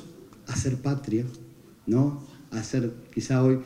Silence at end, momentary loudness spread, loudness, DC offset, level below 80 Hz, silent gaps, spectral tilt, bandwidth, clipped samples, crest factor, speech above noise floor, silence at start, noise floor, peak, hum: 0 s; 16 LU; -28 LUFS; under 0.1%; -56 dBFS; none; -7 dB/octave; 11.5 kHz; under 0.1%; 18 dB; 20 dB; 0 s; -45 dBFS; -10 dBFS; none